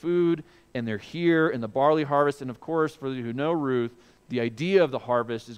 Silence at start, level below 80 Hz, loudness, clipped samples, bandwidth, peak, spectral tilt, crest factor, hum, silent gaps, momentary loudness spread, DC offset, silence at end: 0.05 s; -66 dBFS; -26 LUFS; under 0.1%; 10.5 kHz; -8 dBFS; -7.5 dB/octave; 18 dB; none; none; 10 LU; under 0.1%; 0 s